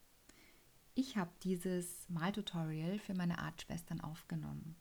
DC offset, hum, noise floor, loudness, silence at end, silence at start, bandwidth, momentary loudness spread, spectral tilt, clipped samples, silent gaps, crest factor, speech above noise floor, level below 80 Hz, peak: under 0.1%; none; -66 dBFS; -42 LUFS; 0 s; 0 s; over 20 kHz; 6 LU; -5.5 dB/octave; under 0.1%; none; 18 dB; 24 dB; -66 dBFS; -26 dBFS